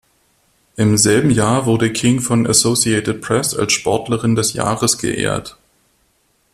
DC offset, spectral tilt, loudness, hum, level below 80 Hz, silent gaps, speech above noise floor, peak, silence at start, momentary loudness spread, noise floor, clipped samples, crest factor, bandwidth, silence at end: under 0.1%; -4 dB/octave; -15 LUFS; none; -46 dBFS; none; 45 dB; 0 dBFS; 0.75 s; 7 LU; -61 dBFS; under 0.1%; 16 dB; 14.5 kHz; 1.05 s